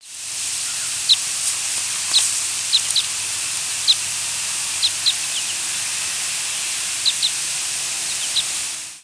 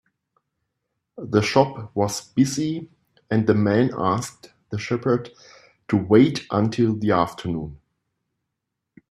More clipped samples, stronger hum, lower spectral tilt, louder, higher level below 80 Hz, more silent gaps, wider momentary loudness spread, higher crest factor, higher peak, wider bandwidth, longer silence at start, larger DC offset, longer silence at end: neither; neither; second, 2.5 dB/octave vs -6 dB/octave; first, -19 LUFS vs -22 LUFS; second, -64 dBFS vs -56 dBFS; neither; second, 5 LU vs 13 LU; about the same, 20 dB vs 22 dB; about the same, -2 dBFS vs 0 dBFS; second, 11 kHz vs 14.5 kHz; second, 0 s vs 1.15 s; neither; second, 0 s vs 1.35 s